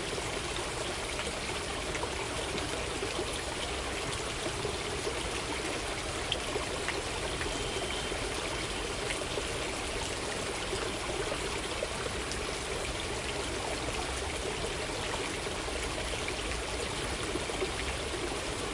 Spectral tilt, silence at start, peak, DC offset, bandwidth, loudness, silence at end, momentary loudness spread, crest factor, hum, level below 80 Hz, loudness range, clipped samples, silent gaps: -3 dB/octave; 0 s; -12 dBFS; under 0.1%; 11.5 kHz; -34 LUFS; 0 s; 1 LU; 22 dB; none; -44 dBFS; 1 LU; under 0.1%; none